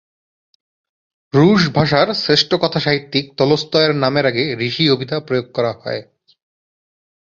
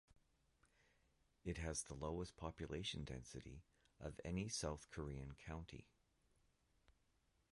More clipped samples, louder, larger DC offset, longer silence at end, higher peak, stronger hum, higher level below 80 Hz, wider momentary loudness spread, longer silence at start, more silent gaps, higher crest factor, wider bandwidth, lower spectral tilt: neither; first, -16 LUFS vs -50 LUFS; neither; second, 1.25 s vs 1.65 s; first, 0 dBFS vs -32 dBFS; neither; first, -52 dBFS vs -60 dBFS; second, 8 LU vs 11 LU; first, 1.35 s vs 0.1 s; neither; about the same, 16 dB vs 20 dB; second, 7.6 kHz vs 11.5 kHz; first, -6 dB/octave vs -4.5 dB/octave